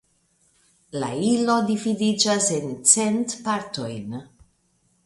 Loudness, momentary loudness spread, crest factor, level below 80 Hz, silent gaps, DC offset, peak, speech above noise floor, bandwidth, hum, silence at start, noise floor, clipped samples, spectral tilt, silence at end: -21 LUFS; 16 LU; 24 dB; -64 dBFS; none; under 0.1%; 0 dBFS; 44 dB; 11.5 kHz; none; 0.95 s; -66 dBFS; under 0.1%; -3 dB/octave; 0.8 s